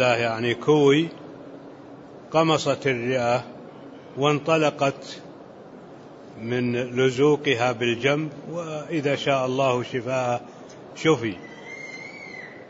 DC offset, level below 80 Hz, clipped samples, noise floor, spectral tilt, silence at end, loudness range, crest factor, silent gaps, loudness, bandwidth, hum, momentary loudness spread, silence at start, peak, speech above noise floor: under 0.1%; -66 dBFS; under 0.1%; -43 dBFS; -5.5 dB/octave; 0 s; 3 LU; 18 dB; none; -23 LUFS; 8 kHz; none; 23 LU; 0 s; -6 dBFS; 21 dB